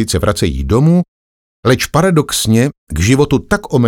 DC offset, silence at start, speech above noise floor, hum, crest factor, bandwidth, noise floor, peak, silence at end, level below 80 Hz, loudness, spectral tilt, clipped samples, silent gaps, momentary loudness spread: under 0.1%; 0 s; over 78 dB; none; 12 dB; 18 kHz; under -90 dBFS; 0 dBFS; 0 s; -28 dBFS; -13 LUFS; -5.5 dB/octave; under 0.1%; 1.08-1.63 s, 2.78-2.87 s; 6 LU